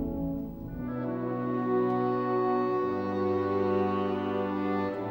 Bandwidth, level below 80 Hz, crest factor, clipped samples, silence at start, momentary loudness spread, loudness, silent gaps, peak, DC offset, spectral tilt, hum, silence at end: 16.5 kHz; -52 dBFS; 12 dB; under 0.1%; 0 s; 7 LU; -30 LUFS; none; -16 dBFS; under 0.1%; -9.5 dB/octave; none; 0 s